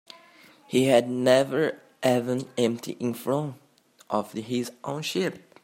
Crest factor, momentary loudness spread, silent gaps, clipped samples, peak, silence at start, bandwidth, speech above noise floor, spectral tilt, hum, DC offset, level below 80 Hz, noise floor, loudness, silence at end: 22 dB; 10 LU; none; under 0.1%; -6 dBFS; 0.7 s; 16 kHz; 29 dB; -5 dB/octave; none; under 0.1%; -72 dBFS; -54 dBFS; -26 LUFS; 0.25 s